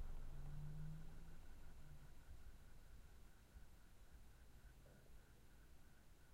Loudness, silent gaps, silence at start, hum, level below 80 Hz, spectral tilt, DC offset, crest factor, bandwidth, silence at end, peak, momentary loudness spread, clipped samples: -63 LUFS; none; 0 s; none; -58 dBFS; -6 dB/octave; under 0.1%; 14 dB; 16 kHz; 0 s; -42 dBFS; 13 LU; under 0.1%